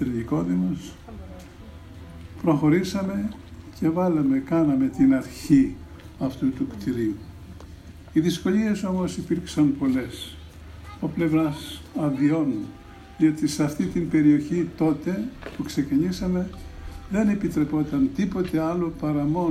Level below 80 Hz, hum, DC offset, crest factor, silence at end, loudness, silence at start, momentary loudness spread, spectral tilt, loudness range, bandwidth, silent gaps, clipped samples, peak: -46 dBFS; none; under 0.1%; 18 dB; 0 s; -24 LUFS; 0 s; 22 LU; -7 dB/octave; 4 LU; 15 kHz; none; under 0.1%; -6 dBFS